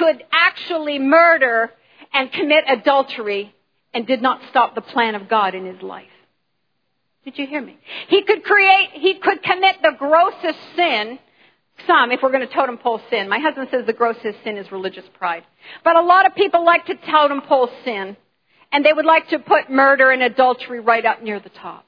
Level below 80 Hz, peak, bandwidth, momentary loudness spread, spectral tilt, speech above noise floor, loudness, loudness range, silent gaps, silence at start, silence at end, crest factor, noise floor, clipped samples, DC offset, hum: -82 dBFS; -2 dBFS; 5.2 kHz; 16 LU; -5.5 dB/octave; 55 dB; -16 LUFS; 6 LU; none; 0 s; 0.1 s; 16 dB; -72 dBFS; under 0.1%; under 0.1%; none